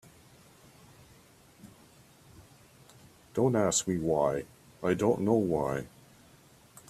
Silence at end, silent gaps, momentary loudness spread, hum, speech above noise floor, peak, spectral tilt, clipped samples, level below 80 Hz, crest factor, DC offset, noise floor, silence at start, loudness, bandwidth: 1.05 s; none; 11 LU; none; 31 dB; -12 dBFS; -5 dB/octave; under 0.1%; -62 dBFS; 20 dB; under 0.1%; -58 dBFS; 1.65 s; -29 LUFS; 15 kHz